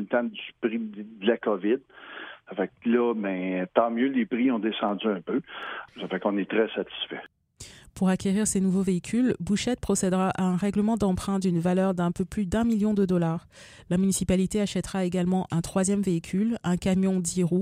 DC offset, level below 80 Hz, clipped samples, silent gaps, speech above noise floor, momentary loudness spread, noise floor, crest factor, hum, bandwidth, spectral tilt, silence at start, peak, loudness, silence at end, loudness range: under 0.1%; -50 dBFS; under 0.1%; none; 23 dB; 10 LU; -48 dBFS; 20 dB; none; 14.5 kHz; -5.5 dB/octave; 0 s; -6 dBFS; -26 LUFS; 0 s; 3 LU